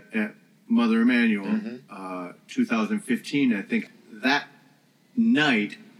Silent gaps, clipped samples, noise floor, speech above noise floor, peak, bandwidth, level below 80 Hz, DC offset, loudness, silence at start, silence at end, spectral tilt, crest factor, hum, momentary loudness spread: none; under 0.1%; -60 dBFS; 36 dB; -8 dBFS; 12 kHz; under -90 dBFS; under 0.1%; -24 LUFS; 0.1 s; 0.25 s; -5.5 dB/octave; 16 dB; none; 16 LU